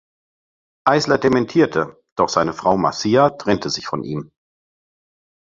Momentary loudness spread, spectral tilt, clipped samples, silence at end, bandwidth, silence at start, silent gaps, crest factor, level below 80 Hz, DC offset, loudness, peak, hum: 10 LU; -5 dB/octave; under 0.1%; 1.25 s; 7.8 kHz; 0.85 s; 2.12-2.16 s; 18 dB; -52 dBFS; under 0.1%; -18 LUFS; -2 dBFS; none